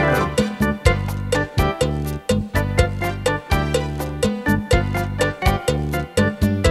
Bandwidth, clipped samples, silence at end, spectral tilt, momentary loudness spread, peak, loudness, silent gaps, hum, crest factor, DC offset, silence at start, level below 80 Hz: 15.5 kHz; under 0.1%; 0 s; -5.5 dB/octave; 4 LU; 0 dBFS; -21 LUFS; none; none; 20 dB; under 0.1%; 0 s; -28 dBFS